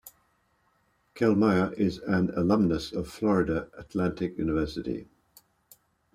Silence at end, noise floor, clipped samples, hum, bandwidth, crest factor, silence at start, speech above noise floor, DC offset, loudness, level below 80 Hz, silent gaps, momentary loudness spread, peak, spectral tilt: 1.1 s; -70 dBFS; under 0.1%; none; 15 kHz; 18 dB; 0.05 s; 43 dB; under 0.1%; -27 LUFS; -52 dBFS; none; 11 LU; -10 dBFS; -7.5 dB/octave